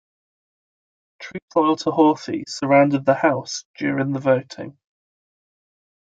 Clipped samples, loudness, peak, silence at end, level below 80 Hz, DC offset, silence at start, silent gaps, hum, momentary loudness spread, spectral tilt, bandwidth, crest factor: under 0.1%; -20 LUFS; -2 dBFS; 1.35 s; -70 dBFS; under 0.1%; 1.2 s; 1.42-1.48 s, 3.65-3.74 s; none; 19 LU; -5.5 dB/octave; 8 kHz; 20 dB